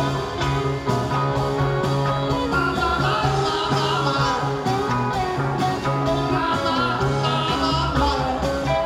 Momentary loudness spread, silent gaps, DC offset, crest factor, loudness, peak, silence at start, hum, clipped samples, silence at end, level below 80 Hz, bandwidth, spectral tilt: 3 LU; none; under 0.1%; 14 dB; -21 LUFS; -8 dBFS; 0 s; none; under 0.1%; 0 s; -36 dBFS; 15 kHz; -6 dB/octave